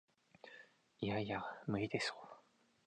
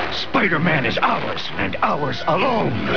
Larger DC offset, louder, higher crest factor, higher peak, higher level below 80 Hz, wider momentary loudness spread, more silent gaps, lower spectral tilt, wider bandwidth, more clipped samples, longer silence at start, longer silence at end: second, under 0.1% vs 3%; second, -42 LUFS vs -20 LUFS; first, 20 dB vs 14 dB; second, -26 dBFS vs -4 dBFS; second, -72 dBFS vs -46 dBFS; first, 20 LU vs 6 LU; neither; about the same, -5.5 dB/octave vs -6.5 dB/octave; first, 9.6 kHz vs 5.4 kHz; neither; first, 0.45 s vs 0 s; first, 0.45 s vs 0 s